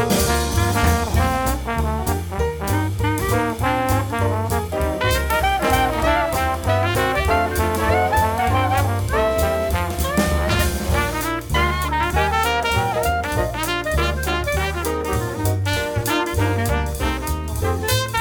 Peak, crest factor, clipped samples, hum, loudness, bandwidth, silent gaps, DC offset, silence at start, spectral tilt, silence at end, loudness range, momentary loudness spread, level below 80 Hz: -4 dBFS; 16 dB; under 0.1%; none; -20 LUFS; over 20 kHz; none; under 0.1%; 0 s; -5 dB/octave; 0 s; 3 LU; 5 LU; -28 dBFS